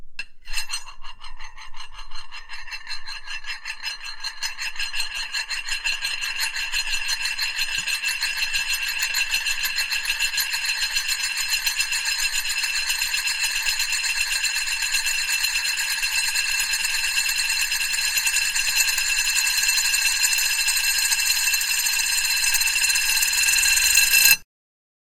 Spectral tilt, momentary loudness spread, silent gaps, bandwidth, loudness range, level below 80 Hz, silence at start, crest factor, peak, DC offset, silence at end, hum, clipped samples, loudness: 3.5 dB/octave; 14 LU; none; 16 kHz; 12 LU; -42 dBFS; 0 s; 24 dB; 0 dBFS; under 0.1%; 0.65 s; none; under 0.1%; -20 LUFS